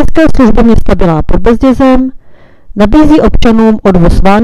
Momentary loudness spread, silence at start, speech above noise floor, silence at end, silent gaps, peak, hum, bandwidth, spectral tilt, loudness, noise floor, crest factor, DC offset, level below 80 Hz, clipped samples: 5 LU; 0 s; 29 dB; 0 s; none; 0 dBFS; none; 11 kHz; -7.5 dB/octave; -7 LUFS; -33 dBFS; 4 dB; under 0.1%; -14 dBFS; 7%